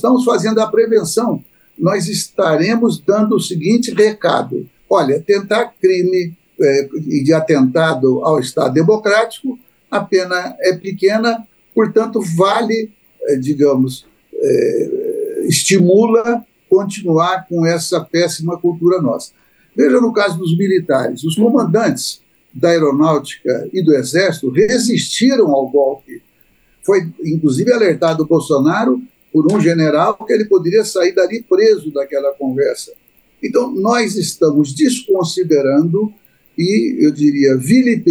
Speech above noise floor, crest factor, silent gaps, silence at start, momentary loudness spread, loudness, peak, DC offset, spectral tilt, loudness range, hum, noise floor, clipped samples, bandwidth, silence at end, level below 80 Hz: 41 dB; 14 dB; none; 0.05 s; 8 LU; -14 LUFS; -2 dBFS; under 0.1%; -5.5 dB/octave; 2 LU; none; -54 dBFS; under 0.1%; over 20 kHz; 0 s; -62 dBFS